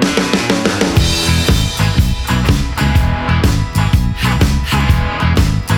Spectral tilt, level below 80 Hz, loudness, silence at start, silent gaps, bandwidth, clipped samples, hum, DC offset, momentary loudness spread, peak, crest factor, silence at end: -5 dB/octave; -20 dBFS; -14 LUFS; 0 s; none; 19.5 kHz; under 0.1%; none; under 0.1%; 2 LU; 0 dBFS; 12 dB; 0 s